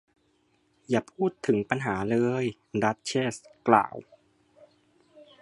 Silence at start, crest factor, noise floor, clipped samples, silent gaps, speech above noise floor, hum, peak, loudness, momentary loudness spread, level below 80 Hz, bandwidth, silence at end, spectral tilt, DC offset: 0.9 s; 26 dB; -69 dBFS; under 0.1%; none; 42 dB; none; -4 dBFS; -27 LUFS; 9 LU; -64 dBFS; 11.5 kHz; 0.2 s; -6 dB/octave; under 0.1%